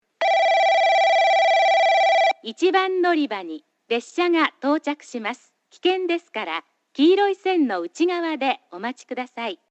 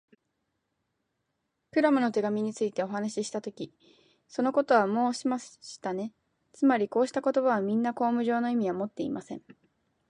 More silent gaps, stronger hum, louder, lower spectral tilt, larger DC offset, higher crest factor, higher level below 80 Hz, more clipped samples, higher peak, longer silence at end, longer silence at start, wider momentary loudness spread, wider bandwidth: neither; neither; first, -20 LUFS vs -28 LUFS; second, -2.5 dB/octave vs -5.5 dB/octave; neither; about the same, 16 dB vs 20 dB; second, -82 dBFS vs -76 dBFS; neither; first, -6 dBFS vs -10 dBFS; second, 0.15 s vs 0.6 s; second, 0.2 s vs 1.75 s; about the same, 14 LU vs 14 LU; second, 8.4 kHz vs 10.5 kHz